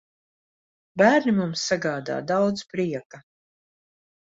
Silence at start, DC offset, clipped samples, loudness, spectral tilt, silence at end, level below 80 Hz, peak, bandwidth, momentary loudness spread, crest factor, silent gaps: 0.95 s; under 0.1%; under 0.1%; -23 LUFS; -5 dB/octave; 1.05 s; -66 dBFS; -6 dBFS; 8 kHz; 11 LU; 20 dB; 3.05-3.10 s